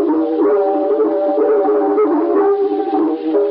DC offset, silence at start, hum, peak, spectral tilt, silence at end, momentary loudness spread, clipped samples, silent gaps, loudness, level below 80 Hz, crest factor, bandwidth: under 0.1%; 0 s; none; -4 dBFS; -4.5 dB/octave; 0 s; 3 LU; under 0.1%; none; -15 LUFS; -68 dBFS; 10 dB; 4.8 kHz